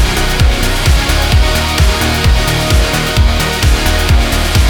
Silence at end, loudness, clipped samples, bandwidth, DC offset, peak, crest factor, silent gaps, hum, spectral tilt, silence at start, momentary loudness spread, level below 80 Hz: 0 s; -12 LUFS; under 0.1%; 19.5 kHz; under 0.1%; 0 dBFS; 10 dB; none; none; -4 dB/octave; 0 s; 1 LU; -12 dBFS